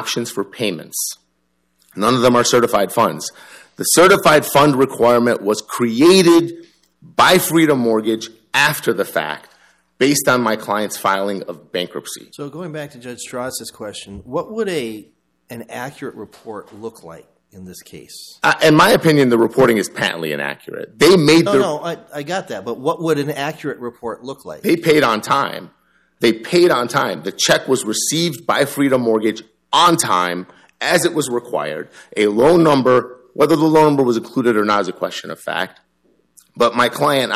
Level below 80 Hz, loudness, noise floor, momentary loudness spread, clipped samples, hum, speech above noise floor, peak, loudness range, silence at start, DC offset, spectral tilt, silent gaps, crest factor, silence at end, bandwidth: -54 dBFS; -16 LUFS; -66 dBFS; 19 LU; under 0.1%; none; 50 dB; -2 dBFS; 13 LU; 0 s; under 0.1%; -4 dB/octave; none; 16 dB; 0 s; 15 kHz